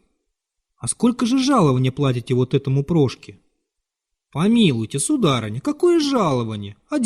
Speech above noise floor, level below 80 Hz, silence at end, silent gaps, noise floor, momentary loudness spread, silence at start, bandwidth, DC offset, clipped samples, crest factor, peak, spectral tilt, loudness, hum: 62 dB; -52 dBFS; 0 s; none; -81 dBFS; 10 LU; 0.85 s; 13 kHz; under 0.1%; under 0.1%; 16 dB; -4 dBFS; -6 dB/octave; -19 LUFS; none